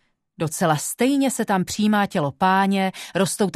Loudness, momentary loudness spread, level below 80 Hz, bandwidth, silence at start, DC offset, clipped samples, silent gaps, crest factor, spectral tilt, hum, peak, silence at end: -21 LUFS; 5 LU; -60 dBFS; 14 kHz; 0.4 s; under 0.1%; under 0.1%; none; 16 dB; -4.5 dB/octave; none; -6 dBFS; 0.05 s